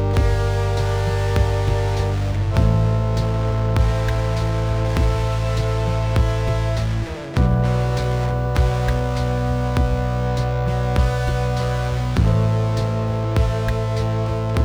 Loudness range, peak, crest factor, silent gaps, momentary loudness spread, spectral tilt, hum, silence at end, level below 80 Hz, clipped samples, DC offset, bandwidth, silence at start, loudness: 1 LU; -6 dBFS; 14 dB; none; 3 LU; -7 dB/octave; none; 0 s; -24 dBFS; under 0.1%; under 0.1%; 12 kHz; 0 s; -21 LUFS